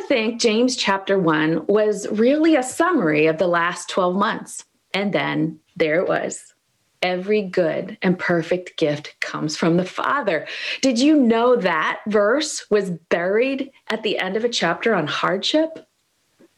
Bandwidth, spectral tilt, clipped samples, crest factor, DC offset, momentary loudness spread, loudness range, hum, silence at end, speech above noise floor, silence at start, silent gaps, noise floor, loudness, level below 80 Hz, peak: 12.5 kHz; -4.5 dB/octave; under 0.1%; 18 dB; under 0.1%; 8 LU; 4 LU; none; 0.75 s; 47 dB; 0 s; none; -67 dBFS; -20 LUFS; -66 dBFS; -2 dBFS